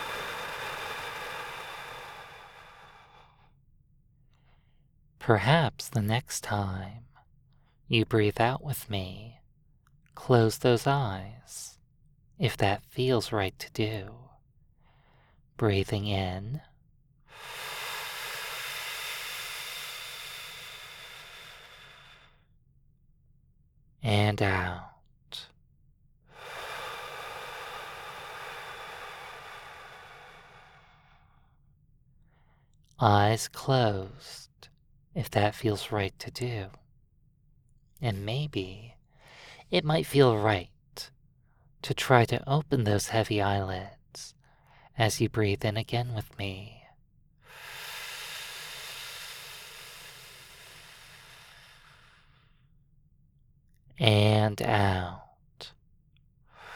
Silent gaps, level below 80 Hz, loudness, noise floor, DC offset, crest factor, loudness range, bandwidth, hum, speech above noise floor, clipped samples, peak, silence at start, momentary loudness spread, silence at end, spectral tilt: none; -56 dBFS; -30 LUFS; -64 dBFS; under 0.1%; 30 dB; 15 LU; 18.5 kHz; none; 36 dB; under 0.1%; -2 dBFS; 0 s; 23 LU; 0 s; -5.5 dB/octave